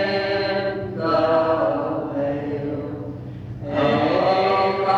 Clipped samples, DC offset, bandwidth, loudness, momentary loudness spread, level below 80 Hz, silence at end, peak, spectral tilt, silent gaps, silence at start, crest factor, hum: under 0.1%; under 0.1%; 7.8 kHz; -21 LUFS; 13 LU; -50 dBFS; 0 s; -8 dBFS; -7.5 dB/octave; none; 0 s; 14 dB; none